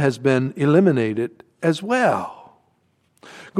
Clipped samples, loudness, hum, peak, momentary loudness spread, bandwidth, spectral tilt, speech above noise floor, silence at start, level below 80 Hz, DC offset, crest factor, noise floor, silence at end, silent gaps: under 0.1%; -20 LUFS; none; -2 dBFS; 11 LU; 13 kHz; -7 dB/octave; 45 dB; 0 s; -68 dBFS; under 0.1%; 18 dB; -64 dBFS; 0 s; none